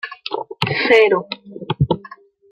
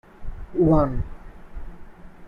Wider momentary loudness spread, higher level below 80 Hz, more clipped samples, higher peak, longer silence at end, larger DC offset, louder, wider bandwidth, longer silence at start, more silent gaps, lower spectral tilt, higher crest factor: second, 15 LU vs 25 LU; second, -46 dBFS vs -34 dBFS; neither; first, -2 dBFS vs -6 dBFS; first, 0.45 s vs 0 s; neither; first, -18 LUFS vs -22 LUFS; first, 10 kHz vs 5.2 kHz; second, 0.05 s vs 0.2 s; neither; second, -6.5 dB/octave vs -11 dB/octave; about the same, 18 dB vs 18 dB